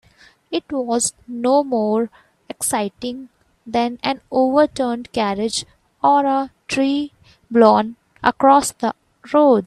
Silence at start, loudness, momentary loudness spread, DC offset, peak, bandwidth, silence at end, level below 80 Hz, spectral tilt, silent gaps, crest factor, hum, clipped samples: 0.5 s; -19 LUFS; 14 LU; under 0.1%; 0 dBFS; 13.5 kHz; 0 s; -56 dBFS; -3.5 dB/octave; none; 18 dB; none; under 0.1%